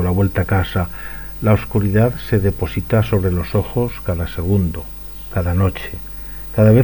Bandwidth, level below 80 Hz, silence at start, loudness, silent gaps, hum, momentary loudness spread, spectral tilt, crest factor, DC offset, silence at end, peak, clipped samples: 19.5 kHz; -32 dBFS; 0 s; -19 LUFS; none; none; 13 LU; -8.5 dB/octave; 16 dB; under 0.1%; 0 s; 0 dBFS; under 0.1%